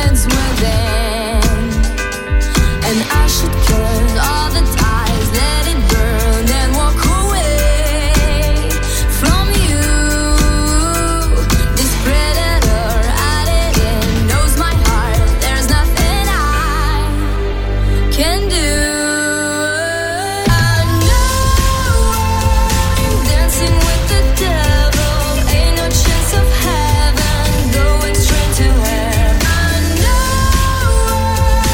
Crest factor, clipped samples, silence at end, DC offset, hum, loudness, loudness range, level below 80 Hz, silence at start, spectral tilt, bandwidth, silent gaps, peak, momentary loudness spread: 12 dB; under 0.1%; 0 s; under 0.1%; none; -14 LUFS; 2 LU; -14 dBFS; 0 s; -4 dB/octave; 17 kHz; none; 0 dBFS; 3 LU